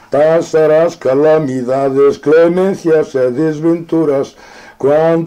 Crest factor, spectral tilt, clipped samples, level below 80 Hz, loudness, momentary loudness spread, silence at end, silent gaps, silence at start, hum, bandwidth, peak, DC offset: 10 dB; -7 dB/octave; under 0.1%; -52 dBFS; -12 LUFS; 5 LU; 0 s; none; 0.1 s; none; 10 kHz; -2 dBFS; under 0.1%